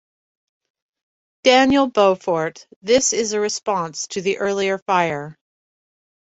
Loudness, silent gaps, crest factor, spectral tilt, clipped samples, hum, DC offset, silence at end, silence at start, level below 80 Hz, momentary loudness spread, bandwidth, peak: -19 LUFS; 2.76-2.81 s, 4.82-4.86 s; 20 dB; -3 dB/octave; under 0.1%; none; under 0.1%; 1 s; 1.45 s; -56 dBFS; 11 LU; 8.2 kHz; -2 dBFS